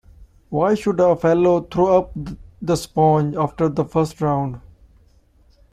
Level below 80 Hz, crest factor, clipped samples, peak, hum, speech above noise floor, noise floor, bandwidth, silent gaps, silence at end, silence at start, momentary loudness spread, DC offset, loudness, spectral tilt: -46 dBFS; 16 dB; under 0.1%; -4 dBFS; none; 36 dB; -54 dBFS; 14.5 kHz; none; 1.15 s; 0.2 s; 14 LU; under 0.1%; -19 LUFS; -7.5 dB/octave